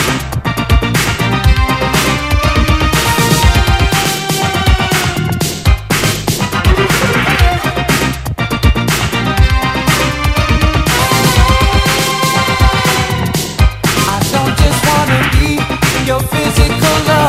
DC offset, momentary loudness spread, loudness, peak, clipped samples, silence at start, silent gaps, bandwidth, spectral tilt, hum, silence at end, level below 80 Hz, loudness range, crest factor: under 0.1%; 4 LU; -12 LUFS; 0 dBFS; under 0.1%; 0 s; none; 16.5 kHz; -4 dB/octave; none; 0 s; -18 dBFS; 2 LU; 12 dB